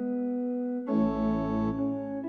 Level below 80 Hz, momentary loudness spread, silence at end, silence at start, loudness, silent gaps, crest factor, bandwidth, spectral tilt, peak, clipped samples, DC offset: -50 dBFS; 4 LU; 0 s; 0 s; -30 LUFS; none; 12 dB; 5.8 kHz; -10 dB/octave; -16 dBFS; under 0.1%; under 0.1%